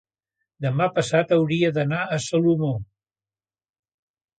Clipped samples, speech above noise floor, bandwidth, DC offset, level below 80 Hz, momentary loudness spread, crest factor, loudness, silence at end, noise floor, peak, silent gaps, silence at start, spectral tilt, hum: under 0.1%; over 69 dB; 9.4 kHz; under 0.1%; -60 dBFS; 7 LU; 18 dB; -22 LUFS; 1.55 s; under -90 dBFS; -6 dBFS; none; 0.6 s; -6 dB/octave; none